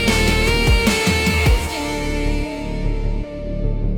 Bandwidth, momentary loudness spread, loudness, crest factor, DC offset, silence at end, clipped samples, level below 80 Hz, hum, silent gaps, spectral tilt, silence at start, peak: 18 kHz; 10 LU; -19 LUFS; 14 dB; under 0.1%; 0 s; under 0.1%; -22 dBFS; none; none; -4.5 dB/octave; 0 s; -4 dBFS